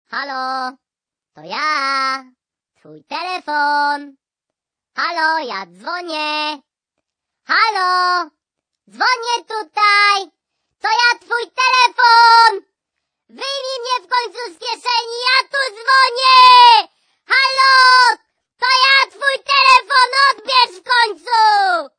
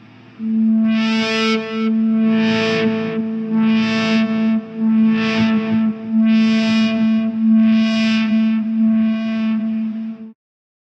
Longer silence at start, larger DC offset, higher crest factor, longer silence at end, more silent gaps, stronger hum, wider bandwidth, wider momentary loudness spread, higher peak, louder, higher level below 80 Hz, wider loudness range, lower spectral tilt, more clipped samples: second, 0.1 s vs 0.4 s; neither; first, 16 dB vs 10 dB; second, 0.1 s vs 0.5 s; neither; neither; first, 10 kHz vs 7.6 kHz; first, 17 LU vs 7 LU; first, 0 dBFS vs -6 dBFS; first, -13 LUFS vs -17 LUFS; second, -70 dBFS vs -64 dBFS; first, 11 LU vs 2 LU; second, 0.5 dB/octave vs -6 dB/octave; neither